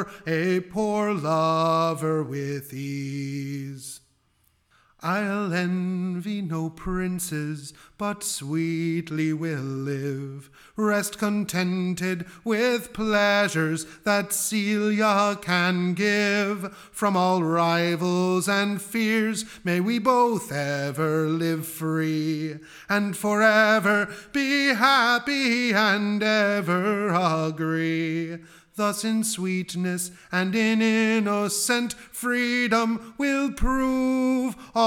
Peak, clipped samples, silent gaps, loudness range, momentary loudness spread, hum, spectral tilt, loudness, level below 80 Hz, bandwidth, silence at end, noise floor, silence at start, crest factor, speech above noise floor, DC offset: -4 dBFS; under 0.1%; none; 8 LU; 10 LU; none; -4.5 dB/octave; -24 LUFS; -46 dBFS; 18 kHz; 0 s; -66 dBFS; 0 s; 20 dB; 42 dB; under 0.1%